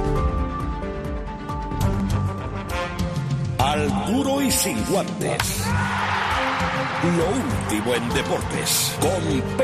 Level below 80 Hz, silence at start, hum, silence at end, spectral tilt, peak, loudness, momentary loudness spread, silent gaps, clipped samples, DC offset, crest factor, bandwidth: -34 dBFS; 0 s; none; 0 s; -4.5 dB/octave; -4 dBFS; -23 LUFS; 9 LU; none; under 0.1%; under 0.1%; 18 dB; 14 kHz